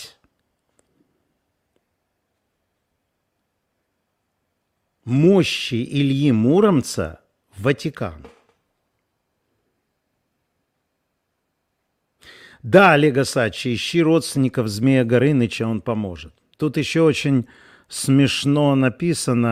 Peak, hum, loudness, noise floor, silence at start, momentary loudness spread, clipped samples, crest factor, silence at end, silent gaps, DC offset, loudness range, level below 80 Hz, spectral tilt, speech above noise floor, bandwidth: 0 dBFS; none; -18 LUFS; -74 dBFS; 0 s; 12 LU; under 0.1%; 20 dB; 0 s; none; under 0.1%; 11 LU; -56 dBFS; -6 dB/octave; 56 dB; 15.5 kHz